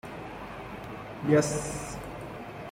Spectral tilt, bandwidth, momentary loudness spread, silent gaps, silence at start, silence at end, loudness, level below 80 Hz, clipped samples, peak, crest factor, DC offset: -5.5 dB/octave; 16 kHz; 16 LU; none; 0.05 s; 0 s; -32 LUFS; -52 dBFS; under 0.1%; -10 dBFS; 22 dB; under 0.1%